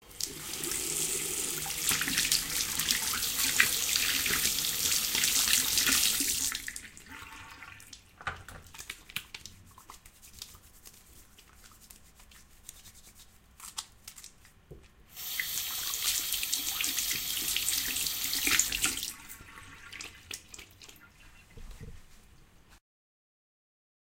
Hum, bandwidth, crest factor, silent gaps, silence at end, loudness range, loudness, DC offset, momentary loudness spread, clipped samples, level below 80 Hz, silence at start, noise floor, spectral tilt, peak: none; 17 kHz; 30 dB; none; 1.35 s; 22 LU; -28 LUFS; under 0.1%; 23 LU; under 0.1%; -56 dBFS; 0.05 s; -57 dBFS; 0.5 dB/octave; -4 dBFS